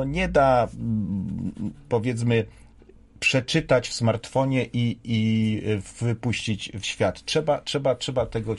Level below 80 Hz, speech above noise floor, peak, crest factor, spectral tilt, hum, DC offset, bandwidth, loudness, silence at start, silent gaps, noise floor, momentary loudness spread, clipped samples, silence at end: -46 dBFS; 27 dB; -8 dBFS; 16 dB; -5.5 dB/octave; none; under 0.1%; 11.5 kHz; -24 LUFS; 0 s; none; -51 dBFS; 8 LU; under 0.1%; 0 s